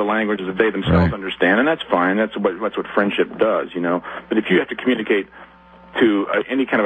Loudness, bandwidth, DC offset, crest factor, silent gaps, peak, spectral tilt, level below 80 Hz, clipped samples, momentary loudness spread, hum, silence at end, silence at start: -19 LUFS; 8.4 kHz; under 0.1%; 16 dB; none; -2 dBFS; -8 dB/octave; -42 dBFS; under 0.1%; 6 LU; none; 0 s; 0 s